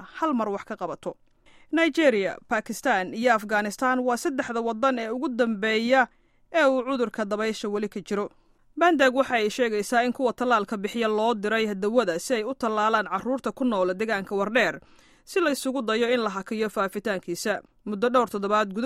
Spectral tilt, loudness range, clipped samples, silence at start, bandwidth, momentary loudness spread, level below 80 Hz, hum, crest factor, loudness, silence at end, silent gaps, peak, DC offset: -4 dB/octave; 2 LU; under 0.1%; 0 s; 15.5 kHz; 8 LU; -64 dBFS; none; 18 dB; -25 LUFS; 0 s; none; -6 dBFS; under 0.1%